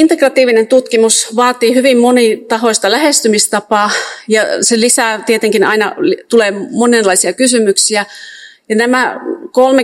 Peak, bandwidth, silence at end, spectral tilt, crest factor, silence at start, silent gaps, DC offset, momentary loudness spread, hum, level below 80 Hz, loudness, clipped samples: 0 dBFS; over 20 kHz; 0 s; -2 dB/octave; 10 dB; 0 s; none; under 0.1%; 6 LU; none; -64 dBFS; -10 LUFS; 0.6%